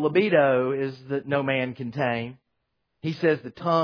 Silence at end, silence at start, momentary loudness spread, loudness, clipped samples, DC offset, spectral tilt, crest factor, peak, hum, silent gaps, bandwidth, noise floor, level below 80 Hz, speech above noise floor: 0 s; 0 s; 12 LU; -25 LUFS; under 0.1%; under 0.1%; -8 dB/octave; 18 dB; -6 dBFS; none; none; 5.4 kHz; -77 dBFS; -68 dBFS; 53 dB